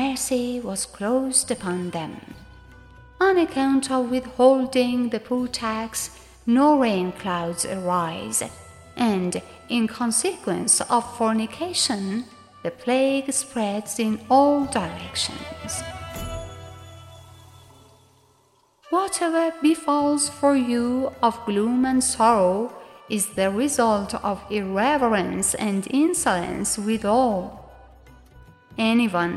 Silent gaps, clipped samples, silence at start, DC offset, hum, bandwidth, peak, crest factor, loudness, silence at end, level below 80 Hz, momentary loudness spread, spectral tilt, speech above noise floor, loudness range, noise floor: none; under 0.1%; 0 s; under 0.1%; none; 15 kHz; -4 dBFS; 20 dB; -22 LUFS; 0 s; -52 dBFS; 13 LU; -3.5 dB/octave; 39 dB; 5 LU; -61 dBFS